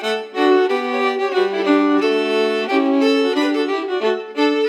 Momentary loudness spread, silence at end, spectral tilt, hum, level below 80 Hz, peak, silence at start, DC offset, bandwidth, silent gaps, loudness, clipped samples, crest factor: 5 LU; 0 s; -4 dB/octave; none; -90 dBFS; -4 dBFS; 0 s; under 0.1%; 11 kHz; none; -17 LUFS; under 0.1%; 14 dB